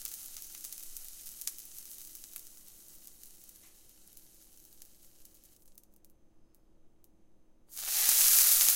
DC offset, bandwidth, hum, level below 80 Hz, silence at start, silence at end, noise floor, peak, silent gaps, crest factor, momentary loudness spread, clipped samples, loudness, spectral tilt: under 0.1%; 17 kHz; none; -66 dBFS; 0 s; 0 s; -60 dBFS; -4 dBFS; none; 30 dB; 27 LU; under 0.1%; -24 LUFS; 3.5 dB/octave